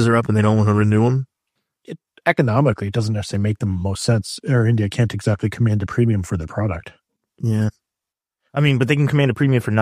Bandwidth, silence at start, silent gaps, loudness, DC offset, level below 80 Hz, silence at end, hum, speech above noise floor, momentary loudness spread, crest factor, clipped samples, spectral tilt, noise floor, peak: 11.5 kHz; 0 s; none; -19 LUFS; under 0.1%; -46 dBFS; 0 s; none; 69 dB; 9 LU; 18 dB; under 0.1%; -7 dB/octave; -87 dBFS; 0 dBFS